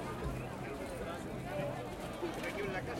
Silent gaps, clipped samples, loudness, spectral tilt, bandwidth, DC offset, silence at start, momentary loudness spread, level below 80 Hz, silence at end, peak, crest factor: none; under 0.1%; -41 LUFS; -5.5 dB/octave; 16.5 kHz; under 0.1%; 0 s; 4 LU; -52 dBFS; 0 s; -26 dBFS; 14 dB